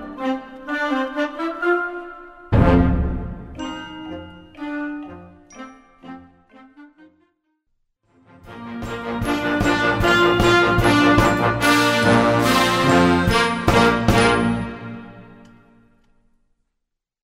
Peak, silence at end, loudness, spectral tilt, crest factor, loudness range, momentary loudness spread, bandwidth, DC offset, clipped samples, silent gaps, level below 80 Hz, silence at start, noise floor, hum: 0 dBFS; 2 s; -18 LUFS; -5.5 dB/octave; 20 dB; 19 LU; 19 LU; 16 kHz; under 0.1%; under 0.1%; none; -34 dBFS; 0 s; -78 dBFS; none